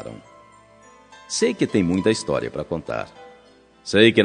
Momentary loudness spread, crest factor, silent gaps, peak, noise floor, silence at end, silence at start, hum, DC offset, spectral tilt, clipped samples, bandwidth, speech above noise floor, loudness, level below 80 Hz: 20 LU; 22 dB; none; 0 dBFS; -52 dBFS; 0 s; 0 s; none; under 0.1%; -4.5 dB/octave; under 0.1%; 10 kHz; 32 dB; -22 LUFS; -56 dBFS